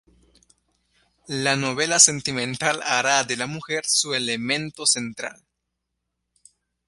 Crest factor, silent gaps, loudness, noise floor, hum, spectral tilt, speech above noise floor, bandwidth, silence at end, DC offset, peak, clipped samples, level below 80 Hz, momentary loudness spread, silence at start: 26 dB; none; -21 LUFS; -80 dBFS; 60 Hz at -55 dBFS; -1.5 dB/octave; 57 dB; 12 kHz; 1.55 s; under 0.1%; 0 dBFS; under 0.1%; -64 dBFS; 13 LU; 1.3 s